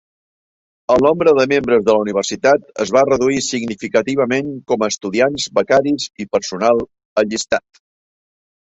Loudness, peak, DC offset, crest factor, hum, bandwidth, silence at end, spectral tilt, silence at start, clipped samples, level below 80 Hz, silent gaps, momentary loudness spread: -16 LUFS; 0 dBFS; under 0.1%; 16 dB; none; 8.2 kHz; 1.05 s; -4 dB/octave; 0.9 s; under 0.1%; -54 dBFS; 7.05-7.16 s; 8 LU